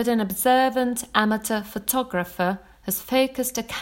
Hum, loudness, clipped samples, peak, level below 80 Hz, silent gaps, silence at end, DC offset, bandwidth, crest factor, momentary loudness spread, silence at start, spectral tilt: none; -23 LUFS; under 0.1%; 0 dBFS; -54 dBFS; none; 0 s; under 0.1%; 17 kHz; 22 dB; 8 LU; 0 s; -3.5 dB/octave